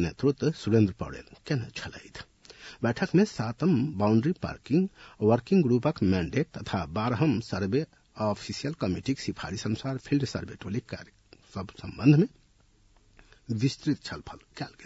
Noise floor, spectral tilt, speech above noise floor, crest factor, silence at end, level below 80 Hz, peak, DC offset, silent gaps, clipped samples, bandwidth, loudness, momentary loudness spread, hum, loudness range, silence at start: -62 dBFS; -7 dB/octave; 35 dB; 20 dB; 0 s; -56 dBFS; -8 dBFS; under 0.1%; none; under 0.1%; 8 kHz; -28 LUFS; 17 LU; none; 6 LU; 0 s